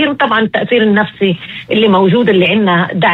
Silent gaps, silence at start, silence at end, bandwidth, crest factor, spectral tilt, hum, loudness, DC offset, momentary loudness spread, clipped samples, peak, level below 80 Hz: none; 0 s; 0 s; 4.4 kHz; 10 dB; -8 dB/octave; none; -11 LUFS; under 0.1%; 6 LU; under 0.1%; 0 dBFS; -52 dBFS